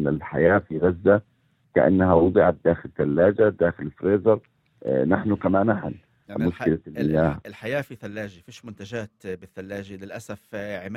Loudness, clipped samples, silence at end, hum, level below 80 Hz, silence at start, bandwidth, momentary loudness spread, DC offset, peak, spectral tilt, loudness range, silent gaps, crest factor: -22 LUFS; under 0.1%; 0 s; none; -50 dBFS; 0 s; 12.5 kHz; 18 LU; under 0.1%; -4 dBFS; -8.5 dB/octave; 10 LU; none; 20 dB